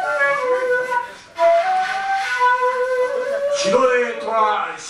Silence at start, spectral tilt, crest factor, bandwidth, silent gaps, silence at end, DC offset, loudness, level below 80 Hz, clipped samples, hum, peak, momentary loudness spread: 0 s; -2.5 dB/octave; 16 dB; 12.5 kHz; none; 0 s; under 0.1%; -18 LUFS; -62 dBFS; under 0.1%; none; -4 dBFS; 5 LU